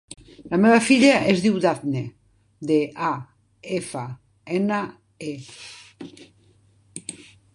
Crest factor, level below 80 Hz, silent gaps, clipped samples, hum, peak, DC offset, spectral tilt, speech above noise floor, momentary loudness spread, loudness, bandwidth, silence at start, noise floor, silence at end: 20 dB; -62 dBFS; none; under 0.1%; none; -2 dBFS; under 0.1%; -5 dB/octave; 37 dB; 26 LU; -21 LUFS; 11.5 kHz; 0.45 s; -58 dBFS; 0.4 s